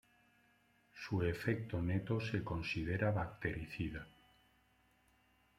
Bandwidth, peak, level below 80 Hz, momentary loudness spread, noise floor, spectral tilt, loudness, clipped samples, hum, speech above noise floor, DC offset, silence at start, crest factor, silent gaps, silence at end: 14 kHz; -20 dBFS; -60 dBFS; 7 LU; -73 dBFS; -7.5 dB/octave; -39 LUFS; under 0.1%; 50 Hz at -60 dBFS; 35 dB; under 0.1%; 0.95 s; 20 dB; none; 1.5 s